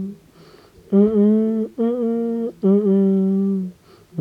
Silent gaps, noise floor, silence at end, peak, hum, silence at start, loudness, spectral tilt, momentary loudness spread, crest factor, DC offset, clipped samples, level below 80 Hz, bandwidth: none; -47 dBFS; 0 s; -6 dBFS; none; 0 s; -18 LUFS; -11 dB/octave; 10 LU; 14 dB; under 0.1%; under 0.1%; -60 dBFS; 4.5 kHz